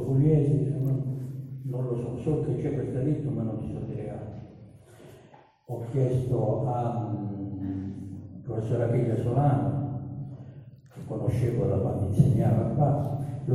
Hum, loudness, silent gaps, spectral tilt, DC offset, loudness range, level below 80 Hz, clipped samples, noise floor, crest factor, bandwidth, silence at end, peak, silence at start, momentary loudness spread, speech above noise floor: none; -28 LUFS; none; -10.5 dB/octave; under 0.1%; 5 LU; -50 dBFS; under 0.1%; -55 dBFS; 20 dB; 11 kHz; 0 s; -6 dBFS; 0 s; 16 LU; 29 dB